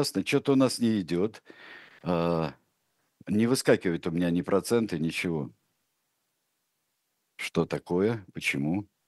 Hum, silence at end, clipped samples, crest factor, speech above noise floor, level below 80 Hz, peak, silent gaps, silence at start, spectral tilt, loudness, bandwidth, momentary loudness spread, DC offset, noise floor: none; 0.25 s; under 0.1%; 22 dB; 51 dB; -62 dBFS; -8 dBFS; none; 0 s; -5.5 dB/octave; -28 LUFS; 12.5 kHz; 12 LU; under 0.1%; -78 dBFS